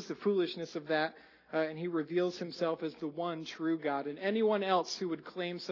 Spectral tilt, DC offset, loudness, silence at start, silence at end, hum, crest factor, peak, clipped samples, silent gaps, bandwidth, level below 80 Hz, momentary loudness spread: -5.5 dB/octave; under 0.1%; -34 LUFS; 0 s; 0 s; none; 18 dB; -16 dBFS; under 0.1%; none; 6 kHz; -82 dBFS; 8 LU